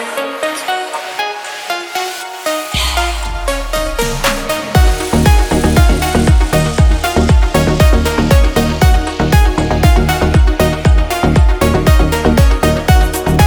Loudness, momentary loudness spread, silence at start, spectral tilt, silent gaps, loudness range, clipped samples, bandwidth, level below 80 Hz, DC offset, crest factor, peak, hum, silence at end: -13 LUFS; 8 LU; 0 s; -5.5 dB/octave; none; 6 LU; under 0.1%; over 20 kHz; -14 dBFS; under 0.1%; 12 dB; 0 dBFS; none; 0 s